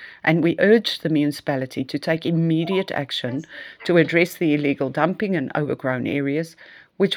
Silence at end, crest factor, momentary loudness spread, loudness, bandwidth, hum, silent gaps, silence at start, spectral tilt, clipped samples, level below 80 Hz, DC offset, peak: 0 s; 20 dB; 10 LU; -21 LUFS; 18 kHz; none; none; 0 s; -6.5 dB/octave; under 0.1%; -68 dBFS; under 0.1%; 0 dBFS